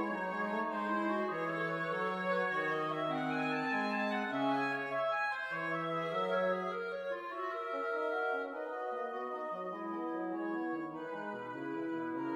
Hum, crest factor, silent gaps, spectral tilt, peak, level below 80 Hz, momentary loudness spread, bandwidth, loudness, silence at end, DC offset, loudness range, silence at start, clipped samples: none; 14 dB; none; -6.5 dB/octave; -22 dBFS; -82 dBFS; 7 LU; 13.5 kHz; -36 LUFS; 0 s; under 0.1%; 5 LU; 0 s; under 0.1%